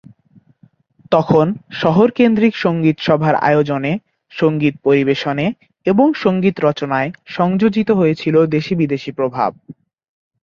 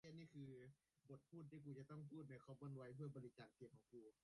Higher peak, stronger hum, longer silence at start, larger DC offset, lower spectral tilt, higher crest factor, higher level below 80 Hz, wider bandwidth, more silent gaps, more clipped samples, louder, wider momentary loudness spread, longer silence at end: first, -2 dBFS vs -44 dBFS; neither; first, 1.1 s vs 0.05 s; neither; about the same, -8 dB/octave vs -8 dB/octave; about the same, 14 dB vs 16 dB; first, -54 dBFS vs -88 dBFS; second, 7.2 kHz vs 11 kHz; neither; neither; first, -16 LUFS vs -60 LUFS; second, 7 LU vs 10 LU; first, 0.7 s vs 0.15 s